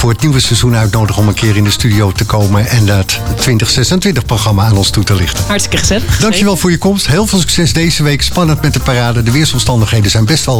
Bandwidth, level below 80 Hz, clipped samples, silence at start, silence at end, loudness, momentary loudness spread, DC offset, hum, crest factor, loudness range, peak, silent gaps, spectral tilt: 19.5 kHz; -24 dBFS; under 0.1%; 0 s; 0 s; -10 LUFS; 2 LU; 2%; none; 10 dB; 0 LU; 0 dBFS; none; -4.5 dB/octave